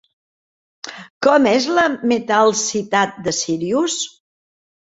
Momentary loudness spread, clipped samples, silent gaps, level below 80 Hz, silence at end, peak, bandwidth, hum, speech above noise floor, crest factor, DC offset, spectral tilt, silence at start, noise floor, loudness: 16 LU; under 0.1%; 1.10-1.21 s; -62 dBFS; 0.85 s; -2 dBFS; 8 kHz; none; over 73 dB; 18 dB; under 0.1%; -3 dB/octave; 0.85 s; under -90 dBFS; -17 LUFS